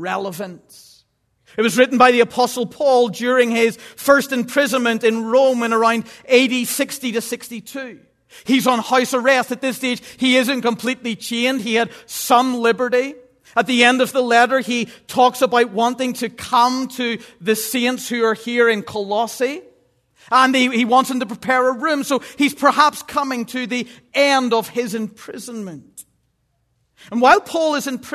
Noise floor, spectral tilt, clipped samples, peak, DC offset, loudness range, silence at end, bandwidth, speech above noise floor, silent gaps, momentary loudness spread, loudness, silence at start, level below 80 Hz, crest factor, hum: -67 dBFS; -3 dB/octave; under 0.1%; 0 dBFS; under 0.1%; 4 LU; 0 s; 14 kHz; 49 dB; none; 12 LU; -17 LUFS; 0 s; -64 dBFS; 18 dB; none